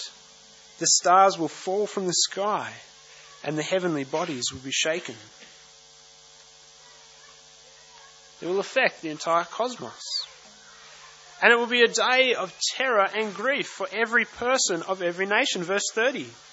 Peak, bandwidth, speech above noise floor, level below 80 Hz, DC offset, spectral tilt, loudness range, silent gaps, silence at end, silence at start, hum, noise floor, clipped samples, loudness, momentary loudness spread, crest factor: 0 dBFS; 8.2 kHz; 27 dB; -72 dBFS; under 0.1%; -1.5 dB/octave; 9 LU; none; 0.15 s; 0 s; none; -52 dBFS; under 0.1%; -24 LUFS; 13 LU; 26 dB